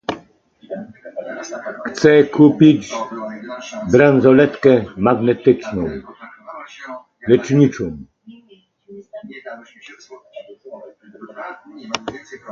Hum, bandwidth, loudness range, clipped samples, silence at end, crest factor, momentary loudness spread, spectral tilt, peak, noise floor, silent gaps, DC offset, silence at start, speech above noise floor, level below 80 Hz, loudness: none; 7.6 kHz; 19 LU; under 0.1%; 0 s; 18 dB; 25 LU; -7 dB/octave; 0 dBFS; -52 dBFS; none; under 0.1%; 0.1 s; 37 dB; -50 dBFS; -15 LUFS